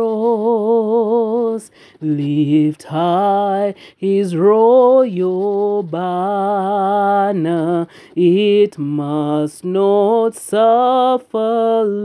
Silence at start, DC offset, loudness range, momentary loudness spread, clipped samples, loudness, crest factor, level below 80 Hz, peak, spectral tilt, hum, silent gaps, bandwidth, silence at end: 0 s; under 0.1%; 3 LU; 8 LU; under 0.1%; -15 LUFS; 14 dB; -72 dBFS; -2 dBFS; -7.5 dB/octave; none; none; 11 kHz; 0 s